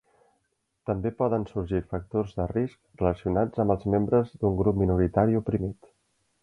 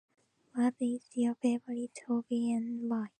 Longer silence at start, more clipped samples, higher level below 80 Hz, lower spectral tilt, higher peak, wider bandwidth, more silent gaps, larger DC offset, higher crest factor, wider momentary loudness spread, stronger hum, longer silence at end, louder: first, 0.85 s vs 0.55 s; neither; first, -44 dBFS vs -86 dBFS; first, -10.5 dB/octave vs -6 dB/octave; first, -8 dBFS vs -18 dBFS; second, 6.2 kHz vs 9.6 kHz; neither; neither; first, 20 dB vs 14 dB; about the same, 7 LU vs 6 LU; neither; first, 0.7 s vs 0.1 s; first, -27 LUFS vs -34 LUFS